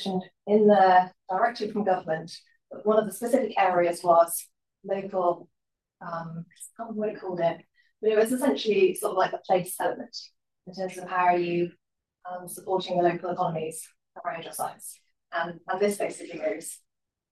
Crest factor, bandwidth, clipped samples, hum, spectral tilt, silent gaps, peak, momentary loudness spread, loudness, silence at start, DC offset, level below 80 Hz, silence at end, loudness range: 18 dB; 14.5 kHz; under 0.1%; none; -5 dB/octave; none; -8 dBFS; 19 LU; -26 LUFS; 0 s; under 0.1%; -78 dBFS; 0.55 s; 7 LU